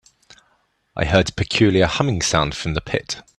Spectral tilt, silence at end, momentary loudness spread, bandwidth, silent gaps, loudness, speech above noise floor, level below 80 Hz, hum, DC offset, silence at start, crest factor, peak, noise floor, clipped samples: -4.5 dB/octave; 0.15 s; 9 LU; 12 kHz; none; -19 LUFS; 45 dB; -38 dBFS; none; under 0.1%; 0.95 s; 20 dB; 0 dBFS; -64 dBFS; under 0.1%